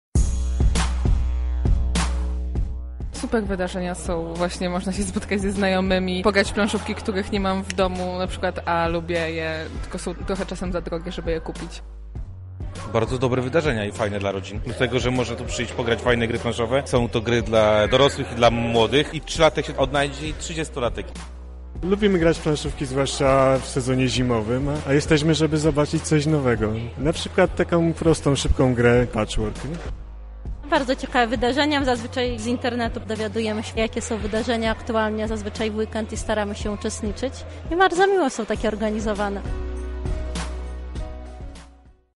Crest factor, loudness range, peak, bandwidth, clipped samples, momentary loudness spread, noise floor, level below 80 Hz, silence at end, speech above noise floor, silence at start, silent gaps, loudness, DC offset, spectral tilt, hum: 18 dB; 6 LU; -4 dBFS; 11.5 kHz; under 0.1%; 13 LU; -50 dBFS; -32 dBFS; 0.45 s; 28 dB; 0.15 s; none; -23 LUFS; under 0.1%; -5.5 dB/octave; none